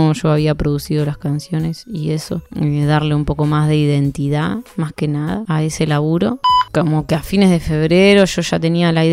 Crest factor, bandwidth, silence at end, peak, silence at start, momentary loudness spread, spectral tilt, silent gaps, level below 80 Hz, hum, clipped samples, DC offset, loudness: 16 dB; 15 kHz; 0 s; 0 dBFS; 0 s; 8 LU; -6.5 dB/octave; none; -36 dBFS; none; under 0.1%; under 0.1%; -16 LUFS